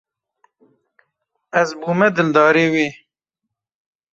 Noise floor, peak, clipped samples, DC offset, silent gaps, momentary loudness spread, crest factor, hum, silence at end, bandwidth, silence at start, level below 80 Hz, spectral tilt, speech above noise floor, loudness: -81 dBFS; -2 dBFS; under 0.1%; under 0.1%; none; 8 LU; 18 dB; none; 1.2 s; 7.8 kHz; 1.55 s; -64 dBFS; -6 dB/octave; 65 dB; -16 LUFS